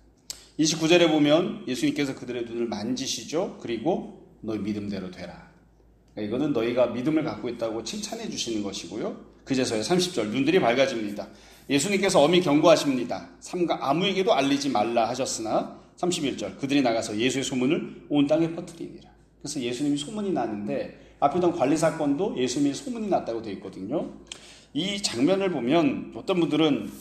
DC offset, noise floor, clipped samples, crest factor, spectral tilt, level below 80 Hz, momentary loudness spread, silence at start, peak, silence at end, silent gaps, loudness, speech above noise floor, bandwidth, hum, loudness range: under 0.1%; -57 dBFS; under 0.1%; 20 dB; -4.5 dB/octave; -60 dBFS; 15 LU; 0.3 s; -6 dBFS; 0 s; none; -25 LUFS; 32 dB; 15 kHz; none; 7 LU